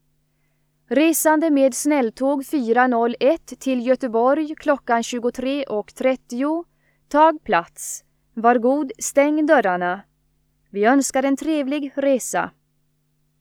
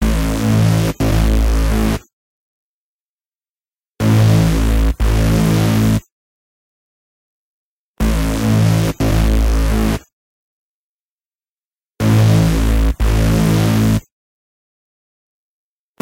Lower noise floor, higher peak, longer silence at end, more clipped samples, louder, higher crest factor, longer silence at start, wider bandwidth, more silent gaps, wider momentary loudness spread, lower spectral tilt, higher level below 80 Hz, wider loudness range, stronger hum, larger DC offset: second, -66 dBFS vs under -90 dBFS; about the same, -2 dBFS vs -2 dBFS; second, 0.9 s vs 2 s; neither; second, -20 LUFS vs -15 LUFS; about the same, 18 dB vs 14 dB; first, 0.9 s vs 0 s; first, 19 kHz vs 16.5 kHz; second, none vs 2.13-3.39 s, 3.48-3.55 s, 3.61-3.72 s, 3.87-3.93 s, 6.11-7.94 s, 10.12-11.40 s, 11.48-11.72 s, 11.87-11.91 s; about the same, 9 LU vs 7 LU; second, -3.5 dB/octave vs -6.5 dB/octave; second, -60 dBFS vs -20 dBFS; about the same, 3 LU vs 4 LU; neither; neither